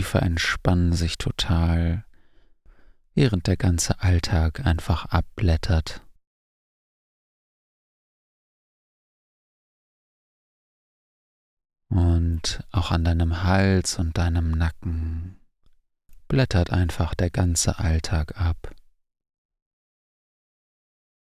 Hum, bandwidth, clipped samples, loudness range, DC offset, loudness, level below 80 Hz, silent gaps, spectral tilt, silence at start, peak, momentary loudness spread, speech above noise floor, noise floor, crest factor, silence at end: none; 14.5 kHz; under 0.1%; 7 LU; under 0.1%; -24 LUFS; -30 dBFS; 6.27-11.57 s; -5.5 dB/octave; 0 s; -4 dBFS; 6 LU; 36 dB; -58 dBFS; 20 dB; 2.55 s